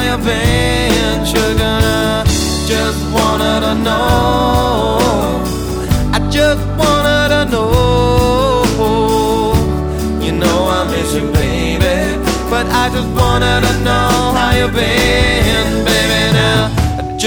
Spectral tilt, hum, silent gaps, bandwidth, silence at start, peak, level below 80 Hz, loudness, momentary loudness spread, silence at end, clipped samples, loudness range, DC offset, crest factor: -5 dB/octave; none; none; over 20 kHz; 0 s; 0 dBFS; -22 dBFS; -13 LUFS; 4 LU; 0 s; under 0.1%; 2 LU; under 0.1%; 12 dB